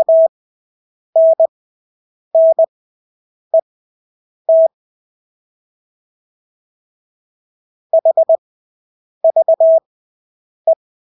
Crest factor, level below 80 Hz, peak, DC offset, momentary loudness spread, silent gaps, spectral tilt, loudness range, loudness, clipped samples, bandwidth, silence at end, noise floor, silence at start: 12 dB; -84 dBFS; -4 dBFS; under 0.1%; 7 LU; 0.29-1.13 s, 1.48-2.31 s, 2.68-3.51 s, 3.62-4.45 s, 4.74-7.90 s, 8.38-9.21 s, 9.86-10.65 s; -9 dB/octave; 5 LU; -14 LUFS; under 0.1%; 1 kHz; 0.4 s; under -90 dBFS; 0 s